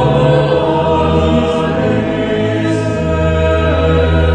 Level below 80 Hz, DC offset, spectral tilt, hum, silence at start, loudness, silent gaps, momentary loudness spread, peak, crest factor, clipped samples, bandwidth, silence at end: -22 dBFS; 0.3%; -7.5 dB/octave; none; 0 s; -13 LUFS; none; 4 LU; 0 dBFS; 12 dB; under 0.1%; 9.2 kHz; 0 s